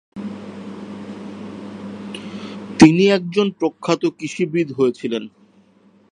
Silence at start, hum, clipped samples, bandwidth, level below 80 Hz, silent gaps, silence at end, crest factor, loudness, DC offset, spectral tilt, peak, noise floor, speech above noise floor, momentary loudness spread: 0.15 s; none; under 0.1%; 10 kHz; -52 dBFS; none; 0.85 s; 20 dB; -17 LUFS; under 0.1%; -6 dB/octave; 0 dBFS; -54 dBFS; 35 dB; 21 LU